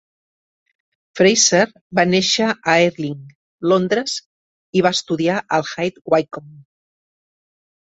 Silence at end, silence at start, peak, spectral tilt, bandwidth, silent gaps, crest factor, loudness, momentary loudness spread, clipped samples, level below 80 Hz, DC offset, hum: 1.2 s; 1.15 s; -2 dBFS; -3.5 dB/octave; 8.2 kHz; 1.81-1.90 s, 3.35-3.59 s, 4.26-4.73 s; 18 dB; -17 LUFS; 14 LU; under 0.1%; -62 dBFS; under 0.1%; none